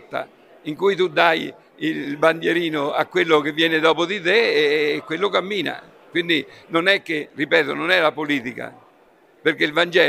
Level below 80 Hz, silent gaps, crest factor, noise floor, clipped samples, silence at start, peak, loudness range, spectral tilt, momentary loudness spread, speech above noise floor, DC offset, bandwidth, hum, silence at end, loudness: -70 dBFS; none; 20 dB; -54 dBFS; under 0.1%; 0.1 s; 0 dBFS; 2 LU; -4.5 dB/octave; 13 LU; 34 dB; under 0.1%; 14.5 kHz; none; 0 s; -20 LUFS